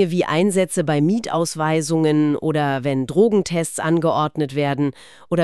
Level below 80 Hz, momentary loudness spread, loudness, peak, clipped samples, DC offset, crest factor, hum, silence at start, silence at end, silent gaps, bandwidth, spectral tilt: -58 dBFS; 5 LU; -19 LUFS; -4 dBFS; under 0.1%; 0.3%; 14 dB; none; 0 s; 0 s; none; 13.5 kHz; -6 dB/octave